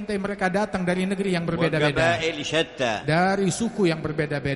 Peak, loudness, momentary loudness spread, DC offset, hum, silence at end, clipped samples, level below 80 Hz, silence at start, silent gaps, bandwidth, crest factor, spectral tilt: -8 dBFS; -23 LUFS; 5 LU; under 0.1%; none; 0 s; under 0.1%; -50 dBFS; 0 s; none; 11.5 kHz; 16 dB; -5 dB/octave